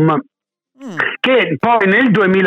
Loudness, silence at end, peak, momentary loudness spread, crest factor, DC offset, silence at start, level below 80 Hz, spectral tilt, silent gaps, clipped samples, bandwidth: -13 LUFS; 0 s; -2 dBFS; 9 LU; 12 dB; under 0.1%; 0 s; -58 dBFS; -7.5 dB/octave; none; under 0.1%; 8 kHz